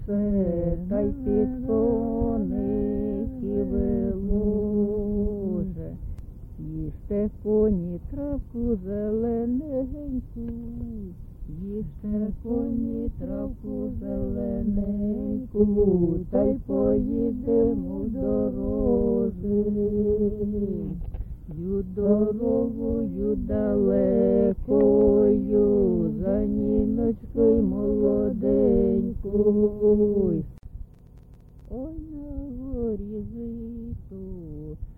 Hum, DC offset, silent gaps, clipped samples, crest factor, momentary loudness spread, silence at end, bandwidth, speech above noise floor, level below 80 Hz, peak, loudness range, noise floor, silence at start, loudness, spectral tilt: none; under 0.1%; none; under 0.1%; 16 dB; 15 LU; 0.05 s; 2.4 kHz; 24 dB; -36 dBFS; -8 dBFS; 10 LU; -48 dBFS; 0 s; -25 LUFS; -13 dB/octave